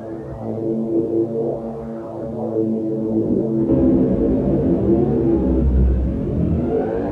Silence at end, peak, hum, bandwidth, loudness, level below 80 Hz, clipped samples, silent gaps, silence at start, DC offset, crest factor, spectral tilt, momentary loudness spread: 0 s; -6 dBFS; none; 3.7 kHz; -19 LUFS; -26 dBFS; under 0.1%; none; 0 s; under 0.1%; 12 dB; -12 dB/octave; 11 LU